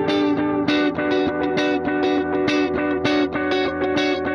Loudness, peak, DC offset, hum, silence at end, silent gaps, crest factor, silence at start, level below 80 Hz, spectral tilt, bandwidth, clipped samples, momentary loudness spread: -20 LUFS; -6 dBFS; under 0.1%; none; 0 s; none; 14 dB; 0 s; -50 dBFS; -5.5 dB/octave; 6.8 kHz; under 0.1%; 2 LU